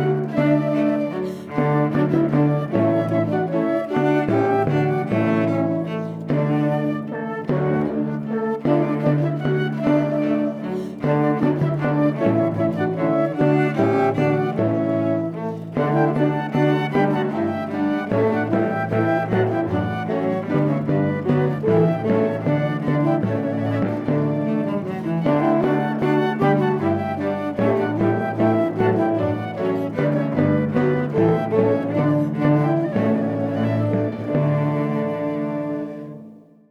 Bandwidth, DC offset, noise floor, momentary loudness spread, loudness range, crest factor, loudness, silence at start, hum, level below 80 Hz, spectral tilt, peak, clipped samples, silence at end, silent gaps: 6.6 kHz; under 0.1%; -43 dBFS; 5 LU; 2 LU; 16 dB; -21 LUFS; 0 s; none; -56 dBFS; -9.5 dB/octave; -4 dBFS; under 0.1%; 0.3 s; none